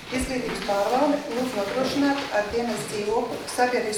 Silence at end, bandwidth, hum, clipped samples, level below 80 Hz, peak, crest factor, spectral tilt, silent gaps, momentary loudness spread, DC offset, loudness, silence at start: 0 s; 18.5 kHz; none; under 0.1%; -48 dBFS; -8 dBFS; 16 dB; -4 dB/octave; none; 5 LU; under 0.1%; -25 LUFS; 0 s